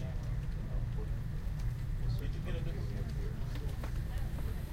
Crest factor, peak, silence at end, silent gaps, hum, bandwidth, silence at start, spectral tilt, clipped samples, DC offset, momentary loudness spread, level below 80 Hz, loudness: 12 dB; -24 dBFS; 0 s; none; none; 16 kHz; 0 s; -7 dB/octave; under 0.1%; under 0.1%; 2 LU; -38 dBFS; -39 LUFS